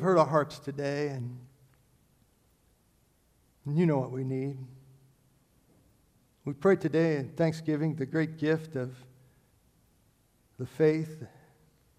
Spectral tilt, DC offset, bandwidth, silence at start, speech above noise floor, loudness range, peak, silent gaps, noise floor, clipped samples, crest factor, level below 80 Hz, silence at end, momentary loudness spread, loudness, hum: -8 dB/octave; under 0.1%; 13 kHz; 0 s; 39 dB; 5 LU; -8 dBFS; none; -68 dBFS; under 0.1%; 22 dB; -70 dBFS; 0.7 s; 17 LU; -30 LUFS; none